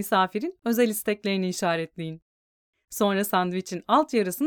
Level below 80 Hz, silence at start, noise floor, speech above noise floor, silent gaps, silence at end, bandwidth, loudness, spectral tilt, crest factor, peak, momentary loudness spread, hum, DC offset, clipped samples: -70 dBFS; 0 s; under -90 dBFS; over 65 dB; 2.22-2.73 s; 0 s; over 20 kHz; -25 LUFS; -4.5 dB/octave; 18 dB; -6 dBFS; 12 LU; none; under 0.1%; under 0.1%